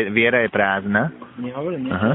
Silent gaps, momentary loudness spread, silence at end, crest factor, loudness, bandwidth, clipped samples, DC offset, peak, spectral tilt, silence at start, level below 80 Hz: none; 12 LU; 0 s; 18 dB; -20 LUFS; 4 kHz; under 0.1%; under 0.1%; -2 dBFS; -4 dB/octave; 0 s; -56 dBFS